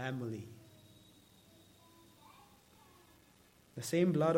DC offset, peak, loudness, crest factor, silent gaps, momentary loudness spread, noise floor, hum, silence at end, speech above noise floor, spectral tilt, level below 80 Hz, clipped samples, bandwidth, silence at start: under 0.1%; -18 dBFS; -36 LUFS; 20 dB; none; 30 LU; -66 dBFS; none; 0 s; 32 dB; -6.5 dB/octave; -76 dBFS; under 0.1%; 16.5 kHz; 0 s